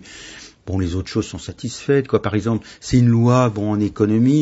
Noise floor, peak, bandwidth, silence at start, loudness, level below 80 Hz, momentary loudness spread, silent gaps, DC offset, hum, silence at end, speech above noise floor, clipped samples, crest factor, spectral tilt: -40 dBFS; -2 dBFS; 8 kHz; 0.05 s; -19 LUFS; -42 dBFS; 15 LU; none; under 0.1%; none; 0 s; 22 dB; under 0.1%; 16 dB; -7 dB/octave